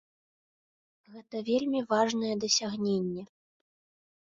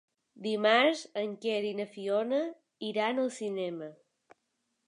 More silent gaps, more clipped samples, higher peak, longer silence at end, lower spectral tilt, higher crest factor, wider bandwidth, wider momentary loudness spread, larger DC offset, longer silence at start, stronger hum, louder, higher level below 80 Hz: neither; neither; about the same, -12 dBFS vs -12 dBFS; about the same, 0.95 s vs 0.95 s; about the same, -3.5 dB/octave vs -4 dB/octave; about the same, 20 dB vs 20 dB; second, 7.8 kHz vs 11 kHz; second, 11 LU vs 15 LU; neither; first, 1.1 s vs 0.35 s; neither; about the same, -29 LUFS vs -31 LUFS; first, -72 dBFS vs -88 dBFS